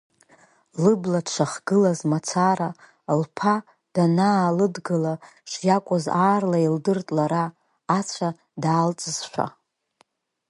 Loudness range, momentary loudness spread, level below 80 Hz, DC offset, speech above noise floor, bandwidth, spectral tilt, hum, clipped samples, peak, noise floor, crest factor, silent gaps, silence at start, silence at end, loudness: 3 LU; 10 LU; -70 dBFS; under 0.1%; 42 dB; 11.5 kHz; -6 dB/octave; none; under 0.1%; -6 dBFS; -64 dBFS; 18 dB; none; 0.75 s; 1 s; -23 LUFS